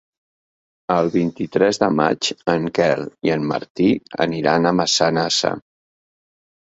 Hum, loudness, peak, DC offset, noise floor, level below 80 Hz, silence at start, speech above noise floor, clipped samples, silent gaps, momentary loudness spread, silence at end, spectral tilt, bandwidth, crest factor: none; -19 LUFS; -2 dBFS; under 0.1%; under -90 dBFS; -56 dBFS; 0.9 s; over 71 dB; under 0.1%; 3.70-3.75 s; 5 LU; 1.1 s; -4.5 dB/octave; 8.2 kHz; 18 dB